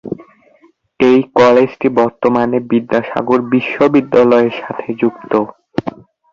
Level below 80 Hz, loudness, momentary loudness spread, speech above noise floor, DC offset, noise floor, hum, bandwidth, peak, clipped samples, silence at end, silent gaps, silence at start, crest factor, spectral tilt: -52 dBFS; -13 LUFS; 13 LU; 39 dB; under 0.1%; -51 dBFS; none; 7.2 kHz; 0 dBFS; under 0.1%; 0.4 s; none; 0.05 s; 14 dB; -7.5 dB/octave